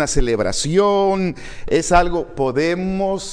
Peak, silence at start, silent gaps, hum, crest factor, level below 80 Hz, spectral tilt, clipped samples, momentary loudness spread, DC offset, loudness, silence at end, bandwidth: -2 dBFS; 0 s; none; none; 16 dB; -28 dBFS; -4.5 dB/octave; under 0.1%; 7 LU; under 0.1%; -18 LUFS; 0 s; 10.5 kHz